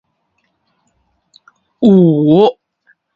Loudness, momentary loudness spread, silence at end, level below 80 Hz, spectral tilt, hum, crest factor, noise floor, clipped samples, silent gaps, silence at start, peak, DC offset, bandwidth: -10 LUFS; 6 LU; 0.65 s; -56 dBFS; -10 dB/octave; none; 14 dB; -65 dBFS; under 0.1%; none; 1.8 s; 0 dBFS; under 0.1%; 7 kHz